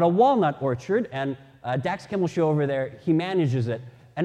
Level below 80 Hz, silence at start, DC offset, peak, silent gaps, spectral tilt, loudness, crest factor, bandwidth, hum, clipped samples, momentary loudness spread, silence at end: -64 dBFS; 0 s; under 0.1%; -8 dBFS; none; -8 dB/octave; -25 LUFS; 16 dB; 9.6 kHz; none; under 0.1%; 11 LU; 0 s